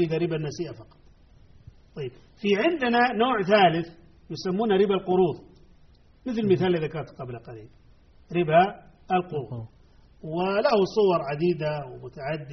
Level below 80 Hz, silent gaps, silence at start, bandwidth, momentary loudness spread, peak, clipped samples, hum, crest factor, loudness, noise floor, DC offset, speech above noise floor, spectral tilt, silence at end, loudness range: -56 dBFS; none; 0 s; 6.4 kHz; 18 LU; -8 dBFS; under 0.1%; none; 18 dB; -24 LUFS; -55 dBFS; under 0.1%; 30 dB; -4.5 dB/octave; 0 s; 5 LU